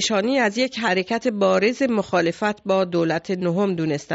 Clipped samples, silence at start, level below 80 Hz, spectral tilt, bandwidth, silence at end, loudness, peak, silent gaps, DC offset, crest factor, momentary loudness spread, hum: under 0.1%; 0 s; -60 dBFS; -4 dB/octave; 8 kHz; 0 s; -21 LUFS; -6 dBFS; none; under 0.1%; 14 dB; 4 LU; none